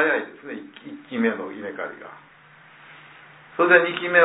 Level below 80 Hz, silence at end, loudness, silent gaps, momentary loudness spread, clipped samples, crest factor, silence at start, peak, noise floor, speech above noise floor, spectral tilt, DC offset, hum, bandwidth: -76 dBFS; 0 s; -22 LUFS; none; 24 LU; under 0.1%; 22 dB; 0 s; -2 dBFS; -50 dBFS; 29 dB; -8.5 dB/octave; under 0.1%; none; 4 kHz